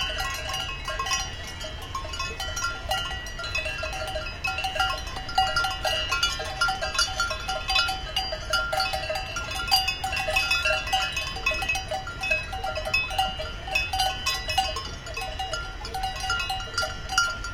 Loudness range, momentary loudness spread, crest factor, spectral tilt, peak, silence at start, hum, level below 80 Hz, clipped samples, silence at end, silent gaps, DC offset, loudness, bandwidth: 5 LU; 9 LU; 22 dB; -1.5 dB/octave; -6 dBFS; 0 s; none; -38 dBFS; under 0.1%; 0 s; none; under 0.1%; -27 LUFS; 17 kHz